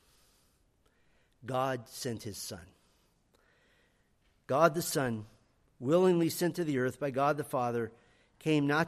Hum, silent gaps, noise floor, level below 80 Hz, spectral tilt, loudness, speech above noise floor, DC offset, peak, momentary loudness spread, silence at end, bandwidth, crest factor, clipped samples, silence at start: none; none; -71 dBFS; -70 dBFS; -5.5 dB/octave; -32 LUFS; 40 dB; under 0.1%; -10 dBFS; 14 LU; 0 s; 15 kHz; 22 dB; under 0.1%; 1.45 s